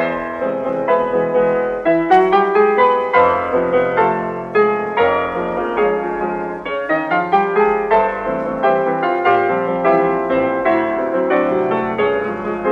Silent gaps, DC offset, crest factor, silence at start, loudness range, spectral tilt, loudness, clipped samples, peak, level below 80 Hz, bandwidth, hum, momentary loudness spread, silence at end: none; under 0.1%; 14 dB; 0 s; 3 LU; -7.5 dB/octave; -16 LUFS; under 0.1%; -2 dBFS; -48 dBFS; 6.2 kHz; none; 8 LU; 0 s